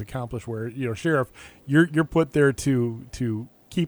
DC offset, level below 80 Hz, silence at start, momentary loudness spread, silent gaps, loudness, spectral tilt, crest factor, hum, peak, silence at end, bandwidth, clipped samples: under 0.1%; -50 dBFS; 0 s; 12 LU; none; -24 LUFS; -6.5 dB/octave; 18 dB; none; -6 dBFS; 0 s; over 20 kHz; under 0.1%